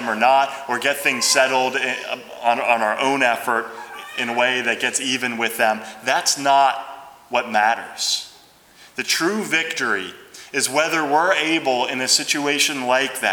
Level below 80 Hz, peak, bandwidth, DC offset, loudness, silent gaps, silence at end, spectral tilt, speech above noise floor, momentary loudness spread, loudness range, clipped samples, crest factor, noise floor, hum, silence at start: -70 dBFS; -2 dBFS; over 20 kHz; under 0.1%; -19 LUFS; none; 0 s; -1 dB/octave; 29 dB; 10 LU; 3 LU; under 0.1%; 18 dB; -49 dBFS; none; 0 s